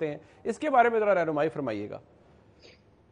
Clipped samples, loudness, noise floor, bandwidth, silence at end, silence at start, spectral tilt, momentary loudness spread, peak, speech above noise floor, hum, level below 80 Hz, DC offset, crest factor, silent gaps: under 0.1%; -27 LUFS; -57 dBFS; 10 kHz; 1.1 s; 0 s; -6.5 dB/octave; 15 LU; -8 dBFS; 29 dB; none; -68 dBFS; under 0.1%; 20 dB; none